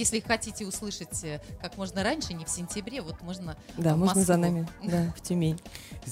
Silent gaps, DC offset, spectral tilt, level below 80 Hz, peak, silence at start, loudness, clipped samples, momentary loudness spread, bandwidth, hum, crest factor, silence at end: none; under 0.1%; -4.5 dB/octave; -50 dBFS; -12 dBFS; 0 s; -30 LUFS; under 0.1%; 15 LU; 16 kHz; none; 18 dB; 0 s